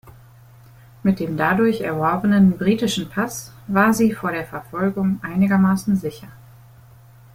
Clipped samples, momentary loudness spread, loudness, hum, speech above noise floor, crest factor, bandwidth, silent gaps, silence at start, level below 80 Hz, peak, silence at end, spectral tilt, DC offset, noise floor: under 0.1%; 10 LU; -20 LUFS; none; 27 dB; 18 dB; 16 kHz; none; 0.05 s; -52 dBFS; -2 dBFS; 1 s; -6 dB/octave; under 0.1%; -46 dBFS